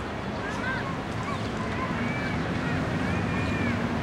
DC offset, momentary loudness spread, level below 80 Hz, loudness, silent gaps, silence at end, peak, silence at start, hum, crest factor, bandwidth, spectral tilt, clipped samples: under 0.1%; 4 LU; -44 dBFS; -29 LUFS; none; 0 s; -16 dBFS; 0 s; none; 12 dB; 13 kHz; -6.5 dB/octave; under 0.1%